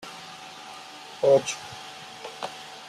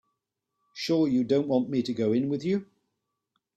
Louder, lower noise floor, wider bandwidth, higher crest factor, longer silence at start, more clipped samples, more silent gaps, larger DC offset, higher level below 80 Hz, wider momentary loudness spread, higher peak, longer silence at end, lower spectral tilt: about the same, -25 LUFS vs -27 LUFS; second, -43 dBFS vs -83 dBFS; about the same, 13.5 kHz vs 12.5 kHz; about the same, 20 dB vs 16 dB; second, 0.05 s vs 0.75 s; neither; neither; neither; about the same, -72 dBFS vs -68 dBFS; first, 20 LU vs 7 LU; first, -8 dBFS vs -12 dBFS; second, 0 s vs 0.9 s; second, -3 dB/octave vs -7 dB/octave